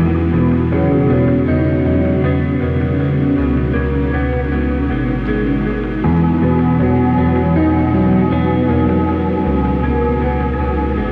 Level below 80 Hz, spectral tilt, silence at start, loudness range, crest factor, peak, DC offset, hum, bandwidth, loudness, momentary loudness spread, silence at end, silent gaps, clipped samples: -24 dBFS; -11 dB/octave; 0 s; 3 LU; 10 dB; -6 dBFS; under 0.1%; none; 4.8 kHz; -15 LUFS; 4 LU; 0 s; none; under 0.1%